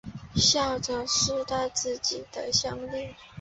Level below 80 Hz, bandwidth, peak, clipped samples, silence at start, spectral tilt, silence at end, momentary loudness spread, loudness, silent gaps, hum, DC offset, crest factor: -50 dBFS; 8.4 kHz; -8 dBFS; under 0.1%; 0.05 s; -2.5 dB/octave; 0 s; 13 LU; -26 LUFS; none; none; under 0.1%; 20 dB